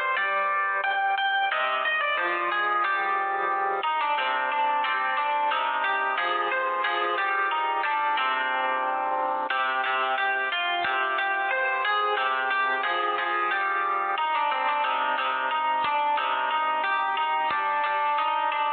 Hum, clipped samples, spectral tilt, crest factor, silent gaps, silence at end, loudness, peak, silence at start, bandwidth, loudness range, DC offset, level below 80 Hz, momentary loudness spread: none; under 0.1%; -5 dB/octave; 12 dB; none; 0 s; -25 LUFS; -14 dBFS; 0 s; 4.7 kHz; 1 LU; under 0.1%; -80 dBFS; 2 LU